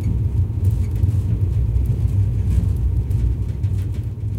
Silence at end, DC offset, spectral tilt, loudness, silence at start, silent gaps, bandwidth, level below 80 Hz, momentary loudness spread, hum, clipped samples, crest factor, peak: 0 s; under 0.1%; -9.5 dB/octave; -21 LUFS; 0 s; none; 9.2 kHz; -24 dBFS; 3 LU; none; under 0.1%; 12 dB; -6 dBFS